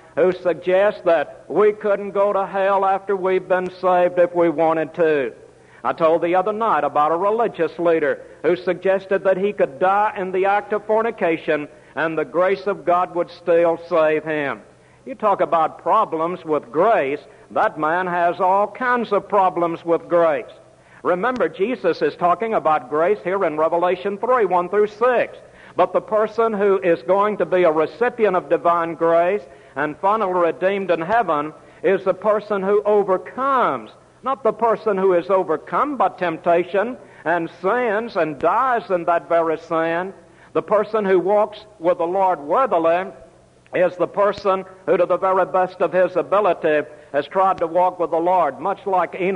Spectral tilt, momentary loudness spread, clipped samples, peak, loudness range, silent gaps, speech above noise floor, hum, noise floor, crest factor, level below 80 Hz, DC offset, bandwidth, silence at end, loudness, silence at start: -7 dB/octave; 6 LU; under 0.1%; -4 dBFS; 2 LU; none; 27 dB; none; -46 dBFS; 14 dB; -62 dBFS; under 0.1%; 10 kHz; 0 s; -19 LUFS; 0.15 s